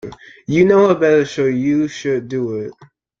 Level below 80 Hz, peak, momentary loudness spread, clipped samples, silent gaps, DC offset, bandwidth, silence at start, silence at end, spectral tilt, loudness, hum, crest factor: -52 dBFS; -2 dBFS; 17 LU; under 0.1%; none; under 0.1%; 7.4 kHz; 0.05 s; 0.5 s; -6.5 dB/octave; -16 LUFS; none; 14 dB